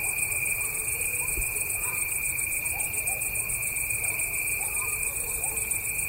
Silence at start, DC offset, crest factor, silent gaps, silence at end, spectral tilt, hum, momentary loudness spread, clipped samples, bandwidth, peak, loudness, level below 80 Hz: 0 s; under 0.1%; 16 dB; none; 0 s; -1 dB/octave; none; 1 LU; under 0.1%; 16.5 kHz; -14 dBFS; -26 LUFS; -46 dBFS